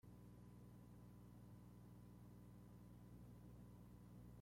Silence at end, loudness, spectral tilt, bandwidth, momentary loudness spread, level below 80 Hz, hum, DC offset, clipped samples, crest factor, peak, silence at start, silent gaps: 0 s; -64 LUFS; -7.5 dB/octave; 16 kHz; 1 LU; -72 dBFS; 60 Hz at -65 dBFS; under 0.1%; under 0.1%; 12 dB; -52 dBFS; 0.05 s; none